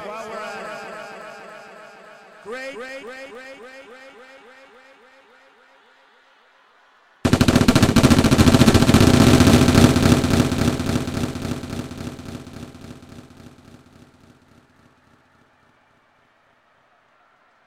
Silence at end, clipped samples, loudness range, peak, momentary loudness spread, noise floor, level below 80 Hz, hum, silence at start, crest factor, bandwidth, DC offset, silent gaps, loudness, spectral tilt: 4.75 s; under 0.1%; 23 LU; 0 dBFS; 26 LU; -59 dBFS; -36 dBFS; none; 0 s; 20 dB; 16.5 kHz; under 0.1%; none; -16 LUFS; -5.5 dB/octave